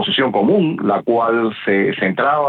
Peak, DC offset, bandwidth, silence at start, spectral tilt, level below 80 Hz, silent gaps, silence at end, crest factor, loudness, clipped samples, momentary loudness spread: -4 dBFS; under 0.1%; 4.7 kHz; 0 s; -8.5 dB/octave; -62 dBFS; none; 0 s; 12 dB; -16 LUFS; under 0.1%; 3 LU